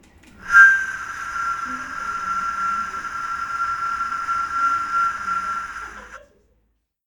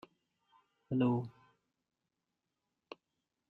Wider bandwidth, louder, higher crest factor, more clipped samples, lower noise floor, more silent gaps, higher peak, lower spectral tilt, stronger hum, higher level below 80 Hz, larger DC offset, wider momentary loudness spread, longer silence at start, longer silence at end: first, 18 kHz vs 4.7 kHz; first, -20 LUFS vs -35 LUFS; about the same, 22 dB vs 22 dB; neither; second, -68 dBFS vs -88 dBFS; neither; first, 0 dBFS vs -20 dBFS; second, -1.5 dB/octave vs -10 dB/octave; neither; first, -52 dBFS vs -76 dBFS; neither; second, 16 LU vs 23 LU; second, 0.4 s vs 0.9 s; second, 0.9 s vs 2.2 s